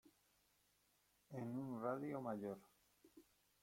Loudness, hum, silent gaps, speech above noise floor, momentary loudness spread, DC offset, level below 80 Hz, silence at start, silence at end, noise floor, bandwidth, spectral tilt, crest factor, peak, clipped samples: -48 LUFS; 50 Hz at -75 dBFS; none; 33 dB; 9 LU; under 0.1%; -86 dBFS; 0.05 s; 0.4 s; -80 dBFS; 16.5 kHz; -8 dB/octave; 20 dB; -30 dBFS; under 0.1%